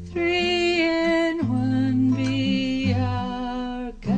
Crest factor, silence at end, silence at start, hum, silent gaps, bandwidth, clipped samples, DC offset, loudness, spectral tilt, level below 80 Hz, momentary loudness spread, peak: 12 dB; 0 s; 0 s; none; none; 9.2 kHz; under 0.1%; under 0.1%; -23 LUFS; -6.5 dB/octave; -44 dBFS; 8 LU; -10 dBFS